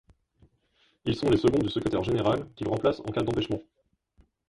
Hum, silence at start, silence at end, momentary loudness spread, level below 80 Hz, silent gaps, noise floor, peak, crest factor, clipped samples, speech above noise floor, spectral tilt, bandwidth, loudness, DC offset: none; 1.05 s; 0.9 s; 9 LU; -50 dBFS; none; -68 dBFS; -10 dBFS; 18 dB; under 0.1%; 42 dB; -7 dB/octave; 11.5 kHz; -27 LUFS; under 0.1%